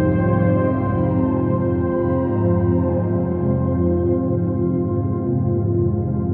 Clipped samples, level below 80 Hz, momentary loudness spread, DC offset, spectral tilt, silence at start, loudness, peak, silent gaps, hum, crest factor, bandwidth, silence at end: under 0.1%; -38 dBFS; 3 LU; under 0.1%; -11.5 dB/octave; 0 s; -19 LUFS; -6 dBFS; none; none; 12 dB; 3.3 kHz; 0 s